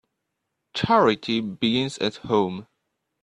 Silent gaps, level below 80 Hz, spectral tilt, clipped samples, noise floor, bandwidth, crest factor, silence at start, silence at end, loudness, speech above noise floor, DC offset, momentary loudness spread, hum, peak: none; -58 dBFS; -5.5 dB/octave; under 0.1%; -79 dBFS; 10.5 kHz; 20 dB; 0.75 s; 0.6 s; -23 LUFS; 57 dB; under 0.1%; 10 LU; none; -6 dBFS